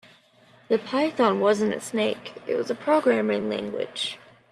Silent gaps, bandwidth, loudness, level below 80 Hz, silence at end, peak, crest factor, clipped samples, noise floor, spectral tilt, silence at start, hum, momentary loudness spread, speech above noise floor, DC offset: none; 13 kHz; -25 LUFS; -70 dBFS; 0.35 s; -8 dBFS; 18 dB; under 0.1%; -56 dBFS; -4.5 dB/octave; 0.7 s; none; 9 LU; 32 dB; under 0.1%